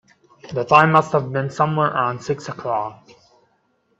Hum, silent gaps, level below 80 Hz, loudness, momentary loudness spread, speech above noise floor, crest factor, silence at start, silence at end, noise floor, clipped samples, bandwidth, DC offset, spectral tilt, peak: none; none; -60 dBFS; -19 LUFS; 14 LU; 46 dB; 20 dB; 0.45 s; 1.05 s; -65 dBFS; under 0.1%; 8 kHz; under 0.1%; -6.5 dB/octave; 0 dBFS